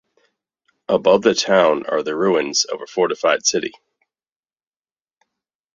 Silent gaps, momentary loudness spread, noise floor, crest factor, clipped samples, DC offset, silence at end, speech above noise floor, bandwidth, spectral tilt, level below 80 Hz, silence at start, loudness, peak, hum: none; 7 LU; under -90 dBFS; 20 dB; under 0.1%; under 0.1%; 2.05 s; over 73 dB; 7.8 kHz; -2.5 dB/octave; -64 dBFS; 0.9 s; -18 LUFS; 0 dBFS; none